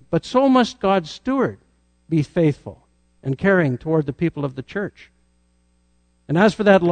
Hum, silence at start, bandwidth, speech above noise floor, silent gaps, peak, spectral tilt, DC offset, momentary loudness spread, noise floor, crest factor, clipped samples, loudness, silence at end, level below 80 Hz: 60 Hz at -50 dBFS; 0.1 s; 9.4 kHz; 43 dB; none; -2 dBFS; -7 dB/octave; under 0.1%; 13 LU; -61 dBFS; 18 dB; under 0.1%; -20 LUFS; 0 s; -52 dBFS